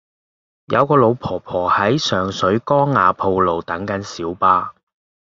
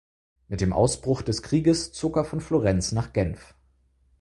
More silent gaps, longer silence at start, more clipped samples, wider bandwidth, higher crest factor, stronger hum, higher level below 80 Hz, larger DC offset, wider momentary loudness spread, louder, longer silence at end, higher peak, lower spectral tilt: neither; first, 0.7 s vs 0.5 s; neither; second, 7.6 kHz vs 11.5 kHz; about the same, 16 dB vs 18 dB; neither; second, -54 dBFS vs -42 dBFS; neither; first, 10 LU vs 6 LU; first, -17 LUFS vs -25 LUFS; second, 0.55 s vs 0.75 s; first, -2 dBFS vs -8 dBFS; about the same, -6 dB/octave vs -6 dB/octave